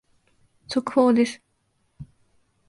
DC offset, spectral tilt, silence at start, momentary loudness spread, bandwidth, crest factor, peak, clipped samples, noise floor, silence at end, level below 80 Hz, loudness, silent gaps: under 0.1%; -5.5 dB/octave; 0.7 s; 11 LU; 11.5 kHz; 18 dB; -8 dBFS; under 0.1%; -70 dBFS; 0.65 s; -62 dBFS; -22 LUFS; none